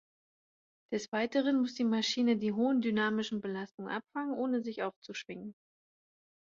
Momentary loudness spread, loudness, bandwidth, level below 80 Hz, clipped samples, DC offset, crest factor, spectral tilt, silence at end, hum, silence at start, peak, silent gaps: 12 LU; -33 LUFS; 7.6 kHz; -78 dBFS; under 0.1%; under 0.1%; 16 dB; -5 dB/octave; 0.95 s; none; 0.9 s; -18 dBFS; 1.08-1.12 s, 3.74-3.78 s, 4.96-5.02 s